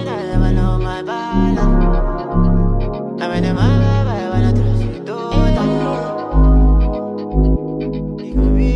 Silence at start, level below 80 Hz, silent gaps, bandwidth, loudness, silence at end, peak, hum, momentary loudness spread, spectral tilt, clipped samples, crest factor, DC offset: 0 s; -18 dBFS; none; 7 kHz; -17 LUFS; 0 s; -2 dBFS; none; 8 LU; -8.5 dB/octave; under 0.1%; 12 dB; under 0.1%